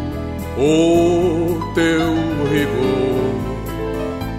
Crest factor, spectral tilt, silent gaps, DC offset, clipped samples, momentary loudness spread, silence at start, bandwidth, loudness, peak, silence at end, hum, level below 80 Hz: 14 dB; -6.5 dB/octave; none; under 0.1%; under 0.1%; 11 LU; 0 s; 15.5 kHz; -18 LUFS; -4 dBFS; 0 s; none; -34 dBFS